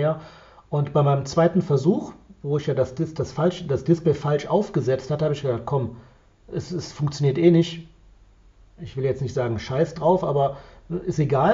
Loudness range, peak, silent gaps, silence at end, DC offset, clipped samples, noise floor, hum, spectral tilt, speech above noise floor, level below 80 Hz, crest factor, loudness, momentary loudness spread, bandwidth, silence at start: 3 LU; -4 dBFS; none; 0 s; under 0.1%; under 0.1%; -52 dBFS; none; -7.5 dB/octave; 30 dB; -50 dBFS; 18 dB; -23 LUFS; 13 LU; 7.6 kHz; 0 s